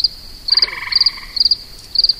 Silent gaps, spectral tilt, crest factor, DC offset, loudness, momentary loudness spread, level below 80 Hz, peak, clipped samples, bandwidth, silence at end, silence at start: none; 0 dB/octave; 16 dB; under 0.1%; -14 LUFS; 5 LU; -40 dBFS; -2 dBFS; under 0.1%; 16 kHz; 0 s; 0 s